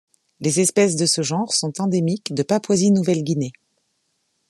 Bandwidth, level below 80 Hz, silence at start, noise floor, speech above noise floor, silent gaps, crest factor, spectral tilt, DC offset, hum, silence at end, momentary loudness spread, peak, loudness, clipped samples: 13 kHz; -66 dBFS; 0.4 s; -70 dBFS; 51 dB; none; 18 dB; -4.5 dB/octave; under 0.1%; none; 1 s; 7 LU; -4 dBFS; -20 LUFS; under 0.1%